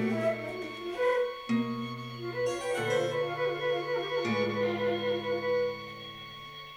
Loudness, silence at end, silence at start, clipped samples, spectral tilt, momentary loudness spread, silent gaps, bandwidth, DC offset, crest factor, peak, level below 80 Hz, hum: -31 LUFS; 0 s; 0 s; under 0.1%; -5.5 dB/octave; 10 LU; none; 16 kHz; under 0.1%; 14 dB; -18 dBFS; -66 dBFS; none